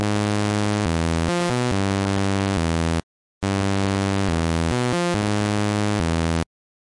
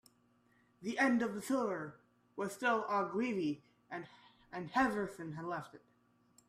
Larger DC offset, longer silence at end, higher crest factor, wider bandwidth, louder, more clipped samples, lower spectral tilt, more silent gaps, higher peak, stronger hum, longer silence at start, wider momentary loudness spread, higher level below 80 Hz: neither; second, 0.4 s vs 0.7 s; second, 12 dB vs 20 dB; second, 11.5 kHz vs 14.5 kHz; first, -22 LUFS vs -37 LUFS; neither; about the same, -5.5 dB/octave vs -5.5 dB/octave; first, 3.03-3.41 s vs none; first, -10 dBFS vs -20 dBFS; second, none vs 60 Hz at -65 dBFS; second, 0 s vs 0.8 s; second, 3 LU vs 16 LU; first, -40 dBFS vs -72 dBFS